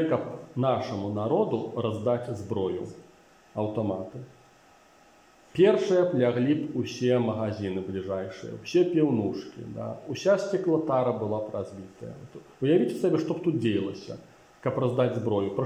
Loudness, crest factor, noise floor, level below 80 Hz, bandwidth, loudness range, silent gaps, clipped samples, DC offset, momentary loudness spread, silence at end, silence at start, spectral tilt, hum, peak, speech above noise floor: -27 LUFS; 18 dB; -57 dBFS; -68 dBFS; 10.5 kHz; 5 LU; none; under 0.1%; under 0.1%; 16 LU; 0 s; 0 s; -7.5 dB/octave; none; -10 dBFS; 30 dB